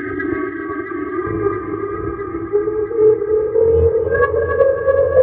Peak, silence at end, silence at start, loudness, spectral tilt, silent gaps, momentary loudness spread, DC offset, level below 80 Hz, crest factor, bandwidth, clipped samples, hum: 0 dBFS; 0 s; 0 s; -17 LUFS; -13 dB/octave; none; 10 LU; under 0.1%; -40 dBFS; 16 dB; 3.4 kHz; under 0.1%; none